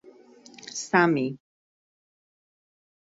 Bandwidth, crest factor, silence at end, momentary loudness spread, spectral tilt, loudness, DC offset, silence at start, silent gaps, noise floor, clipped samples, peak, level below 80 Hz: 8 kHz; 24 dB; 1.75 s; 23 LU; -5 dB/octave; -24 LUFS; under 0.1%; 0.65 s; none; -51 dBFS; under 0.1%; -6 dBFS; -72 dBFS